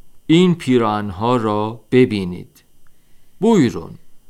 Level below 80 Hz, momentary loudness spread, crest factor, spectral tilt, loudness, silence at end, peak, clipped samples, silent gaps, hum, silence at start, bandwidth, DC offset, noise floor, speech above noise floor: -52 dBFS; 14 LU; 16 dB; -7 dB/octave; -17 LUFS; 0.1 s; -2 dBFS; under 0.1%; none; none; 0.05 s; 13 kHz; under 0.1%; -42 dBFS; 26 dB